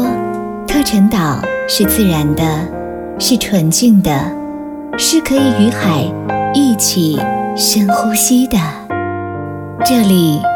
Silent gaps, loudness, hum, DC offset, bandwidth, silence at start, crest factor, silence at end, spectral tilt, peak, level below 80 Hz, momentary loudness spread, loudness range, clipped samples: none; -13 LUFS; none; under 0.1%; over 20 kHz; 0 s; 12 dB; 0 s; -4.5 dB/octave; 0 dBFS; -36 dBFS; 11 LU; 1 LU; under 0.1%